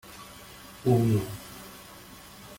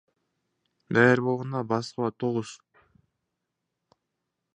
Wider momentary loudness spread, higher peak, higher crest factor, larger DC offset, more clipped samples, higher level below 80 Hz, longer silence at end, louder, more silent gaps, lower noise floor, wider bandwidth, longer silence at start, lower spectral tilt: first, 22 LU vs 11 LU; second, -12 dBFS vs -6 dBFS; second, 18 dB vs 24 dB; neither; neither; first, -56 dBFS vs -70 dBFS; second, 0 s vs 2 s; about the same, -27 LUFS vs -26 LUFS; neither; second, -48 dBFS vs -83 dBFS; first, 17 kHz vs 9.8 kHz; second, 0.05 s vs 0.9 s; about the same, -7 dB/octave vs -6.5 dB/octave